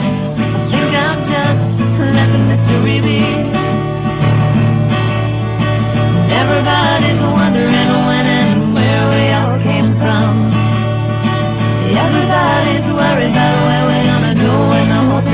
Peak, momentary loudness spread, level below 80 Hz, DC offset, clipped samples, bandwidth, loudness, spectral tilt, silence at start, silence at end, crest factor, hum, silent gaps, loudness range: -2 dBFS; 4 LU; -34 dBFS; under 0.1%; under 0.1%; 4 kHz; -12 LUFS; -11 dB/octave; 0 s; 0 s; 10 dB; none; none; 2 LU